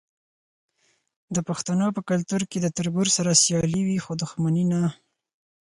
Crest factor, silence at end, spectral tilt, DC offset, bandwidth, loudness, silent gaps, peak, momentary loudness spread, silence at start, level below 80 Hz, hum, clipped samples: 18 dB; 0.65 s; -4.5 dB/octave; under 0.1%; 11.5 kHz; -23 LUFS; none; -6 dBFS; 10 LU; 1.3 s; -58 dBFS; none; under 0.1%